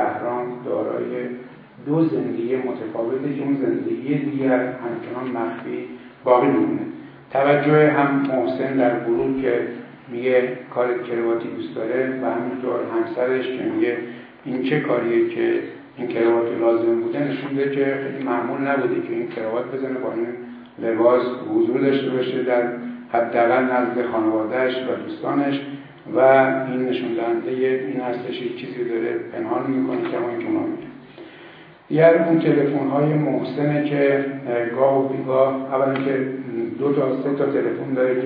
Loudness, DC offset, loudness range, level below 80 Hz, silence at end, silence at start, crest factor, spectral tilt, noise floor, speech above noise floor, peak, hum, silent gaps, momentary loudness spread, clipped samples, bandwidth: -21 LUFS; under 0.1%; 5 LU; -68 dBFS; 0 s; 0 s; 20 dB; -10.5 dB/octave; -44 dBFS; 23 dB; -2 dBFS; none; none; 11 LU; under 0.1%; 5 kHz